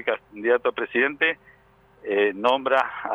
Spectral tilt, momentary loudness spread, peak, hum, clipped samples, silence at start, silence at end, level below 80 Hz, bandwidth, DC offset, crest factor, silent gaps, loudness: -5 dB/octave; 7 LU; -6 dBFS; none; under 0.1%; 0 s; 0 s; -66 dBFS; 8 kHz; under 0.1%; 18 dB; none; -23 LUFS